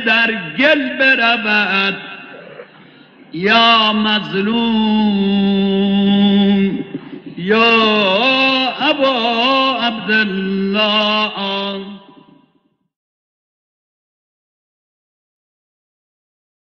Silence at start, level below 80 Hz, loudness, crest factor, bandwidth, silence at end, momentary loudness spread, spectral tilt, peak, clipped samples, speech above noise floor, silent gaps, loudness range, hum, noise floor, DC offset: 0 s; -54 dBFS; -13 LUFS; 16 dB; 6.6 kHz; 4.7 s; 14 LU; -6.5 dB/octave; 0 dBFS; under 0.1%; 47 dB; none; 6 LU; none; -61 dBFS; under 0.1%